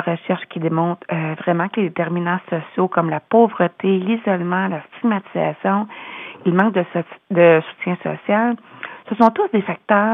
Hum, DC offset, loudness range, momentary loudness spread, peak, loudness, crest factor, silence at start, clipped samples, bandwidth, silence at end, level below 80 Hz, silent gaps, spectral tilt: none; under 0.1%; 3 LU; 10 LU; 0 dBFS; -19 LUFS; 18 dB; 0 s; under 0.1%; 5 kHz; 0 s; -76 dBFS; none; -9.5 dB/octave